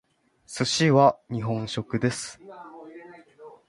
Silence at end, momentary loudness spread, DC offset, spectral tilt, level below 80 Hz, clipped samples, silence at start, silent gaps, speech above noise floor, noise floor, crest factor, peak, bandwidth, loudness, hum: 0.2 s; 25 LU; under 0.1%; -5 dB/octave; -60 dBFS; under 0.1%; 0.5 s; none; 25 dB; -49 dBFS; 22 dB; -6 dBFS; 11.5 kHz; -24 LUFS; none